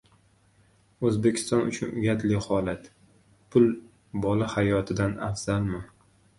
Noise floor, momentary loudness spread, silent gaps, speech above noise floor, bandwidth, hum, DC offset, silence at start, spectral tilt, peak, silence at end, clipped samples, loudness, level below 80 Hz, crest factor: -62 dBFS; 10 LU; none; 37 dB; 11.5 kHz; none; under 0.1%; 1 s; -6.5 dB/octave; -8 dBFS; 0.5 s; under 0.1%; -27 LUFS; -50 dBFS; 20 dB